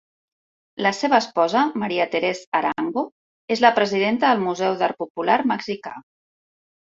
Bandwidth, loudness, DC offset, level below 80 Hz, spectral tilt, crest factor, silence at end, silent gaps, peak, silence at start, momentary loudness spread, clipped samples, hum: 7.8 kHz; -21 LUFS; under 0.1%; -66 dBFS; -4.5 dB/octave; 22 dB; 0.85 s; 2.47-2.52 s, 3.12-3.48 s, 5.10-5.15 s; -2 dBFS; 0.75 s; 11 LU; under 0.1%; none